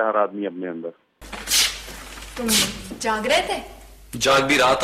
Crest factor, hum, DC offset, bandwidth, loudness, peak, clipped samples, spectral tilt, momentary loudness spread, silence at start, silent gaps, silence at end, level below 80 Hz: 16 dB; none; under 0.1%; 16 kHz; -20 LUFS; -8 dBFS; under 0.1%; -2 dB/octave; 19 LU; 0 s; none; 0 s; -46 dBFS